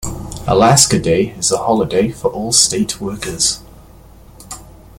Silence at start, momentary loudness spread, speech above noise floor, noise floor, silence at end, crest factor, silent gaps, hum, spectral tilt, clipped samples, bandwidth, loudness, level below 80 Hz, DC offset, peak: 0 s; 17 LU; 26 dB; -40 dBFS; 0.3 s; 16 dB; none; none; -3.5 dB/octave; under 0.1%; 17 kHz; -14 LUFS; -38 dBFS; under 0.1%; 0 dBFS